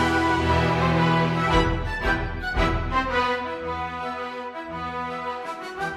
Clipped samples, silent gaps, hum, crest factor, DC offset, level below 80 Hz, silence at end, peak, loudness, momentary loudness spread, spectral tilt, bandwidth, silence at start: under 0.1%; none; none; 16 dB; under 0.1%; -34 dBFS; 0 s; -8 dBFS; -24 LUFS; 11 LU; -6 dB/octave; 12.5 kHz; 0 s